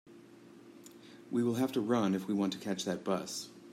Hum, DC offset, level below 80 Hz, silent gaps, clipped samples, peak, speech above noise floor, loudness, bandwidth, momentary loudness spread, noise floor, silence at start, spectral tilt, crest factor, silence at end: none; under 0.1%; -80 dBFS; none; under 0.1%; -18 dBFS; 23 dB; -34 LUFS; 16 kHz; 23 LU; -56 dBFS; 0.05 s; -5.5 dB/octave; 18 dB; 0 s